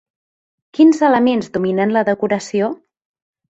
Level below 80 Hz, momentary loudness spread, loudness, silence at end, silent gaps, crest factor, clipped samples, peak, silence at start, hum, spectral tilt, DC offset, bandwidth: -60 dBFS; 10 LU; -16 LUFS; 0.75 s; none; 16 dB; under 0.1%; -2 dBFS; 0.8 s; none; -6 dB/octave; under 0.1%; 8 kHz